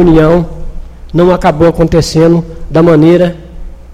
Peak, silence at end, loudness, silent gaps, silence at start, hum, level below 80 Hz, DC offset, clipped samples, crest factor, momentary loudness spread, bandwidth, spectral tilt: 0 dBFS; 0 s; -8 LUFS; none; 0 s; none; -22 dBFS; 0.8%; 1%; 8 dB; 11 LU; 13 kHz; -7.5 dB/octave